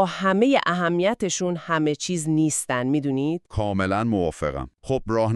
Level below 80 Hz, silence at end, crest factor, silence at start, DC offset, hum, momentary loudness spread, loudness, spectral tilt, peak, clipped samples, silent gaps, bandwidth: -46 dBFS; 0 s; 18 dB; 0 s; under 0.1%; none; 7 LU; -23 LUFS; -5 dB/octave; -4 dBFS; under 0.1%; none; 13 kHz